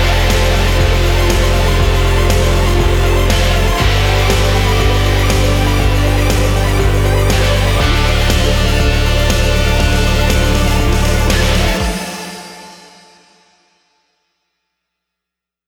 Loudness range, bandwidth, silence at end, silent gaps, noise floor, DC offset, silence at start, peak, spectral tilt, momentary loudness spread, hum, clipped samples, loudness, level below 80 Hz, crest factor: 5 LU; 18.5 kHz; 2.95 s; none; -82 dBFS; under 0.1%; 0 s; 0 dBFS; -4.5 dB/octave; 1 LU; none; under 0.1%; -13 LUFS; -16 dBFS; 12 dB